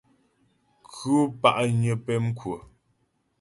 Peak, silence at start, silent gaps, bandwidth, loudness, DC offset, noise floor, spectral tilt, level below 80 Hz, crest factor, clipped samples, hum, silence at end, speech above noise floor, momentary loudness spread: -4 dBFS; 0.9 s; none; 11.5 kHz; -25 LUFS; under 0.1%; -71 dBFS; -6.5 dB/octave; -60 dBFS; 22 dB; under 0.1%; none; 0.8 s; 47 dB; 15 LU